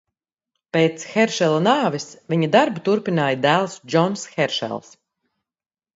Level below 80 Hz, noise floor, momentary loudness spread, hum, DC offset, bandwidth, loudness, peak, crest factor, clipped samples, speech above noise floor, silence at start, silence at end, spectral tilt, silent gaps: -68 dBFS; under -90 dBFS; 8 LU; none; under 0.1%; 8 kHz; -20 LUFS; 0 dBFS; 20 dB; under 0.1%; over 70 dB; 0.75 s; 1.15 s; -5 dB/octave; none